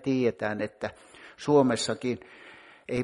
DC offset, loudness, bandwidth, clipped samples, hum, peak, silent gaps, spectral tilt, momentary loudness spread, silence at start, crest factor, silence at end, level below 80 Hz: under 0.1%; -28 LUFS; 11.5 kHz; under 0.1%; none; -10 dBFS; none; -5.5 dB/octave; 25 LU; 0.05 s; 20 dB; 0 s; -62 dBFS